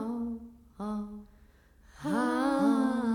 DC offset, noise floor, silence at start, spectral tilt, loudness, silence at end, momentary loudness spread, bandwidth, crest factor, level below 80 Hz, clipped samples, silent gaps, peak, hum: under 0.1%; -59 dBFS; 0 s; -6 dB/octave; -31 LUFS; 0 s; 17 LU; 17 kHz; 16 dB; -60 dBFS; under 0.1%; none; -16 dBFS; none